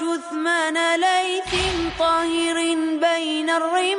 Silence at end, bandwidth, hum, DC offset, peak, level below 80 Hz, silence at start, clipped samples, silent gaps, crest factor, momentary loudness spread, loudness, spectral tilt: 0 s; 10.5 kHz; none; under 0.1%; -8 dBFS; -44 dBFS; 0 s; under 0.1%; none; 12 dB; 3 LU; -21 LUFS; -3 dB/octave